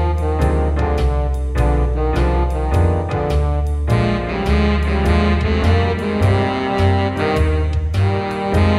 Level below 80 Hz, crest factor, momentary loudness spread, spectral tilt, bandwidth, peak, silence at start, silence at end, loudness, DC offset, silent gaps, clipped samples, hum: -20 dBFS; 12 dB; 3 LU; -7.5 dB/octave; 11.5 kHz; -4 dBFS; 0 s; 0 s; -18 LUFS; under 0.1%; none; under 0.1%; none